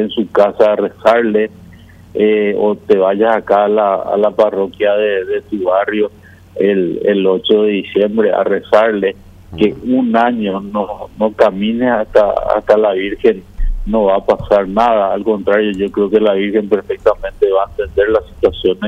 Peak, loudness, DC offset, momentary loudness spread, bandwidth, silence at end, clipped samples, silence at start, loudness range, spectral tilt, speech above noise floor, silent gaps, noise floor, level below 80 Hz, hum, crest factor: 0 dBFS; -14 LUFS; under 0.1%; 7 LU; 7.6 kHz; 0 s; under 0.1%; 0 s; 2 LU; -7 dB/octave; 25 dB; none; -38 dBFS; -32 dBFS; none; 12 dB